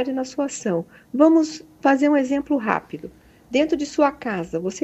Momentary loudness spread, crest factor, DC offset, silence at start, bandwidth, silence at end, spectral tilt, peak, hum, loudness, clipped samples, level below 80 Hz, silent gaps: 11 LU; 18 dB; under 0.1%; 0 s; 8.4 kHz; 0.05 s; -5 dB/octave; -2 dBFS; none; -21 LUFS; under 0.1%; -58 dBFS; none